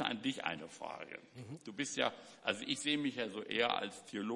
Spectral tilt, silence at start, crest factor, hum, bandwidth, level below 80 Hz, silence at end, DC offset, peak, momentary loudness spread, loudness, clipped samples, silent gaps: -3 dB/octave; 0 s; 24 dB; none; 11.5 kHz; -84 dBFS; 0 s; under 0.1%; -16 dBFS; 14 LU; -38 LUFS; under 0.1%; none